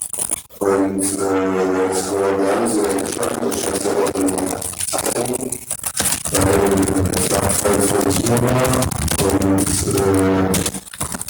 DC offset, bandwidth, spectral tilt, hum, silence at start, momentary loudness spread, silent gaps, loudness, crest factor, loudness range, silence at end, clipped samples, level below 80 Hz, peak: under 0.1%; over 20 kHz; -4 dB/octave; none; 0 s; 6 LU; none; -18 LUFS; 16 dB; 3 LU; 0 s; under 0.1%; -38 dBFS; -2 dBFS